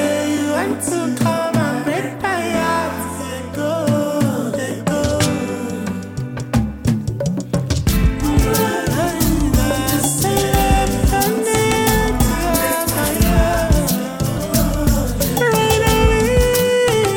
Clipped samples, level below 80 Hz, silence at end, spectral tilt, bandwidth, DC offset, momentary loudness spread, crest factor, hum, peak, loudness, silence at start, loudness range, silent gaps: under 0.1%; -24 dBFS; 0 s; -5 dB/octave; over 20 kHz; under 0.1%; 7 LU; 16 dB; none; 0 dBFS; -17 LUFS; 0 s; 4 LU; none